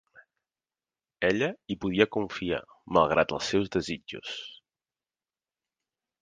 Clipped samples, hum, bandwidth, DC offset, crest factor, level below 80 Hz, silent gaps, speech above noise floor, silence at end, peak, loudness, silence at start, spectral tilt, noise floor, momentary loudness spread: under 0.1%; none; 9.6 kHz; under 0.1%; 26 dB; -58 dBFS; none; over 62 dB; 1.65 s; -6 dBFS; -28 LUFS; 1.2 s; -5 dB/octave; under -90 dBFS; 13 LU